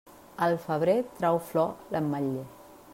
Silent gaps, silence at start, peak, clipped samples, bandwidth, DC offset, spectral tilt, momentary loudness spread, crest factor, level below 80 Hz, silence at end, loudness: none; 0.4 s; -14 dBFS; under 0.1%; 16 kHz; under 0.1%; -7 dB/octave; 10 LU; 16 dB; -66 dBFS; 0 s; -29 LUFS